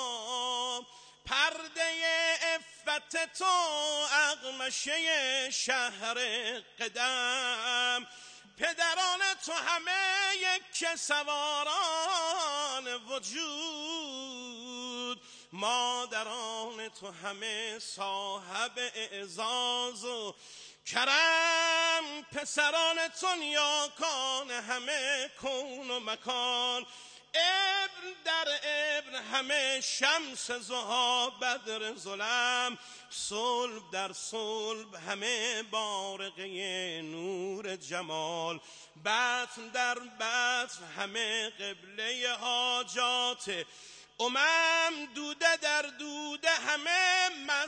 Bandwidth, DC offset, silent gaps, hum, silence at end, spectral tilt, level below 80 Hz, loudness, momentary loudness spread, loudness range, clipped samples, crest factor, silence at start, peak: 10 kHz; under 0.1%; none; none; 0 s; 0 dB/octave; -78 dBFS; -31 LUFS; 12 LU; 6 LU; under 0.1%; 22 dB; 0 s; -12 dBFS